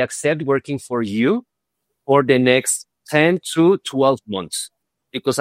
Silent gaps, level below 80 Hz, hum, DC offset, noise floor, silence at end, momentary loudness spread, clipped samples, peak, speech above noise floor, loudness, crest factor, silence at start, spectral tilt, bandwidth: none; -64 dBFS; none; under 0.1%; -77 dBFS; 0 s; 11 LU; under 0.1%; 0 dBFS; 59 dB; -18 LUFS; 18 dB; 0 s; -4.5 dB/octave; 16 kHz